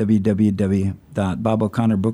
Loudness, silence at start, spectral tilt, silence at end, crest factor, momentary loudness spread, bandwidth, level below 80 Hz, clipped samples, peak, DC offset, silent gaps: -20 LUFS; 0 s; -8.5 dB/octave; 0 s; 14 dB; 6 LU; 11 kHz; -48 dBFS; under 0.1%; -6 dBFS; under 0.1%; none